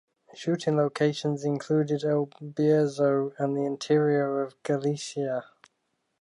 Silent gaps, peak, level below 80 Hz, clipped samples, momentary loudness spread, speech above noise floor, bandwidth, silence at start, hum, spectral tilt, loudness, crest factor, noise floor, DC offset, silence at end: none; -12 dBFS; -78 dBFS; under 0.1%; 8 LU; 51 dB; 11 kHz; 0.35 s; none; -6.5 dB/octave; -27 LUFS; 16 dB; -77 dBFS; under 0.1%; 0.8 s